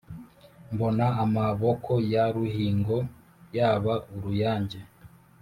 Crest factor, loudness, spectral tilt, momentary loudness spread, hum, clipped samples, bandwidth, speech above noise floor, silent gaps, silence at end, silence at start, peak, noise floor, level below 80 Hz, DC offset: 16 dB; -27 LUFS; -9 dB/octave; 12 LU; none; under 0.1%; 14 kHz; 27 dB; none; 0.35 s; 0.1 s; -12 dBFS; -53 dBFS; -56 dBFS; under 0.1%